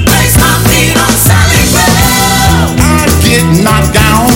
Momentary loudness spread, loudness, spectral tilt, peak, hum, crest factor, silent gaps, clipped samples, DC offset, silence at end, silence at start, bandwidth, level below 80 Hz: 2 LU; -6 LUFS; -4 dB/octave; 0 dBFS; none; 6 dB; none; 1%; under 0.1%; 0 s; 0 s; over 20 kHz; -18 dBFS